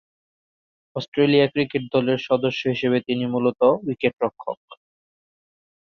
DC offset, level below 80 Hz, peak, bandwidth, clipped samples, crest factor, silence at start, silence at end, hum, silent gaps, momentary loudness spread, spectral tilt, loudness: under 0.1%; -64 dBFS; -4 dBFS; 6.6 kHz; under 0.1%; 20 dB; 0.95 s; 1.2 s; none; 1.08-1.12 s, 4.57-4.68 s; 14 LU; -7.5 dB/octave; -21 LUFS